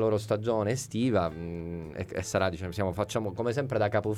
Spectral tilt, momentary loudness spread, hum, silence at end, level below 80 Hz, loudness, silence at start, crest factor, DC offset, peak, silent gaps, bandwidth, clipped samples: -6 dB/octave; 9 LU; none; 0 s; -58 dBFS; -30 LUFS; 0 s; 16 dB; under 0.1%; -12 dBFS; none; 15.5 kHz; under 0.1%